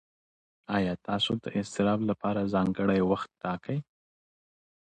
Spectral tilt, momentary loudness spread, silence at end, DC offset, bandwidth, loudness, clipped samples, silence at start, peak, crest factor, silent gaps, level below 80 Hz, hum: -6.5 dB/octave; 8 LU; 1.05 s; under 0.1%; 9.4 kHz; -29 LUFS; under 0.1%; 0.7 s; -12 dBFS; 18 dB; none; -58 dBFS; none